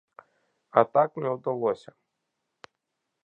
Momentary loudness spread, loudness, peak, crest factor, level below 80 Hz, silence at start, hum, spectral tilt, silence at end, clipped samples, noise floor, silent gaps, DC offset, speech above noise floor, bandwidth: 8 LU; -26 LUFS; -4 dBFS; 26 dB; -76 dBFS; 0.75 s; none; -8 dB/octave; 1.45 s; under 0.1%; -82 dBFS; none; under 0.1%; 57 dB; 8 kHz